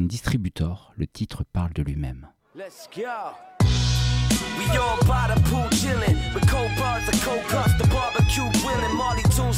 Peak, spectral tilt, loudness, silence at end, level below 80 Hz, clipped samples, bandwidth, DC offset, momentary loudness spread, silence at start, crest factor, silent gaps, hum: -8 dBFS; -5 dB/octave; -23 LUFS; 0 s; -30 dBFS; under 0.1%; 16.5 kHz; under 0.1%; 13 LU; 0 s; 14 dB; none; none